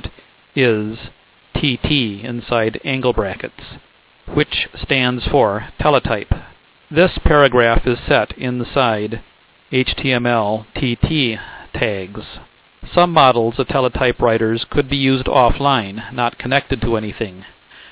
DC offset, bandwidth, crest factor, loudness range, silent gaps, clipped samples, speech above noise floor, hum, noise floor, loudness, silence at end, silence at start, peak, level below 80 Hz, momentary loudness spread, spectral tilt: under 0.1%; 4 kHz; 18 dB; 4 LU; none; under 0.1%; 25 dB; none; -41 dBFS; -17 LUFS; 0.1 s; 0.05 s; 0 dBFS; -32 dBFS; 13 LU; -10 dB/octave